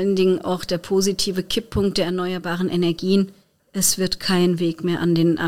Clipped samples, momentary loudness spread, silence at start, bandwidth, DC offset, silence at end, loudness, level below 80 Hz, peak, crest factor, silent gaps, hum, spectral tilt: under 0.1%; 6 LU; 0 s; 17 kHz; 0.6%; 0 s; -21 LUFS; -44 dBFS; -4 dBFS; 16 dB; none; none; -4.5 dB/octave